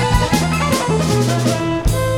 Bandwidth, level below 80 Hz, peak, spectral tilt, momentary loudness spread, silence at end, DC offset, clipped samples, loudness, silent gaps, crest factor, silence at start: 17.5 kHz; -26 dBFS; -2 dBFS; -5 dB/octave; 3 LU; 0 s; under 0.1%; under 0.1%; -16 LUFS; none; 14 dB; 0 s